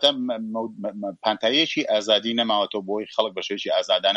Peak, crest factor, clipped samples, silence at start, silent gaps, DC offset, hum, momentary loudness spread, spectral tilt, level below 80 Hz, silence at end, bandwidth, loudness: -4 dBFS; 20 dB; under 0.1%; 0 s; none; under 0.1%; none; 9 LU; -3.5 dB/octave; -74 dBFS; 0 s; 11 kHz; -23 LUFS